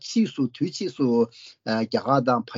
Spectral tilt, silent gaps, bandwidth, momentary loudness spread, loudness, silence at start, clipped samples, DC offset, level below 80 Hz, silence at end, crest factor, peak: -5.5 dB/octave; none; 7.4 kHz; 7 LU; -24 LUFS; 0.05 s; under 0.1%; under 0.1%; -70 dBFS; 0 s; 18 dB; -6 dBFS